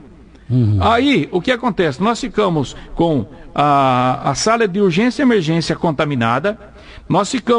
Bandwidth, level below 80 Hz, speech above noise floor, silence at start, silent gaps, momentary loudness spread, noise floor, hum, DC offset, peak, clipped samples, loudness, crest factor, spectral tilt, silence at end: 10.5 kHz; -38 dBFS; 25 dB; 0.5 s; none; 6 LU; -40 dBFS; none; under 0.1%; -2 dBFS; under 0.1%; -16 LUFS; 14 dB; -5.5 dB/octave; 0 s